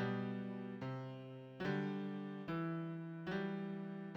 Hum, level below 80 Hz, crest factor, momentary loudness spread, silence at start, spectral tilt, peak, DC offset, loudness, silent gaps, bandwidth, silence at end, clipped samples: none; -76 dBFS; 14 dB; 6 LU; 0 s; -8.5 dB/octave; -28 dBFS; under 0.1%; -44 LUFS; none; 6.6 kHz; 0 s; under 0.1%